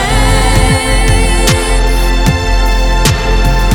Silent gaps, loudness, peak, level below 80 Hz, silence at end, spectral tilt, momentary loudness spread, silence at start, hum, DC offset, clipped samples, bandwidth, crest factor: none; -11 LUFS; 0 dBFS; -10 dBFS; 0 s; -4 dB/octave; 3 LU; 0 s; none; under 0.1%; under 0.1%; 17.5 kHz; 8 dB